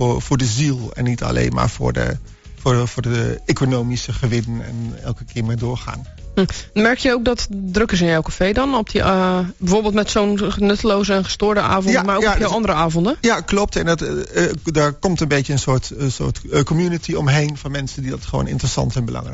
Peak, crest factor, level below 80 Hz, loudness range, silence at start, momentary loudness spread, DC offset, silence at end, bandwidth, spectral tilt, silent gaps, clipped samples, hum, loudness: -2 dBFS; 16 dB; -32 dBFS; 4 LU; 0 s; 8 LU; under 0.1%; 0 s; 8 kHz; -5 dB/octave; none; under 0.1%; none; -19 LUFS